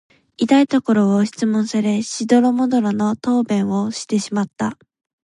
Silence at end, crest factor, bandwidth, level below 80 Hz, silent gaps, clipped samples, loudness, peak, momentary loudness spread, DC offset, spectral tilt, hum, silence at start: 0.5 s; 16 dB; 11 kHz; -62 dBFS; none; under 0.1%; -18 LUFS; -2 dBFS; 8 LU; under 0.1%; -5.5 dB/octave; none; 0.4 s